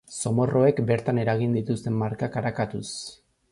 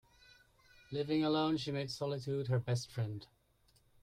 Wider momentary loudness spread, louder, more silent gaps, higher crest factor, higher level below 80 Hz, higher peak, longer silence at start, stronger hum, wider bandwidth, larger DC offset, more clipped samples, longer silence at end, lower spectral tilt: first, 12 LU vs 9 LU; first, -25 LUFS vs -37 LUFS; neither; about the same, 18 dB vs 16 dB; first, -56 dBFS vs -70 dBFS; first, -8 dBFS vs -22 dBFS; second, 0.1 s vs 0.9 s; neither; second, 11.5 kHz vs 13.5 kHz; neither; neither; second, 0.4 s vs 0.8 s; about the same, -6.5 dB/octave vs -6.5 dB/octave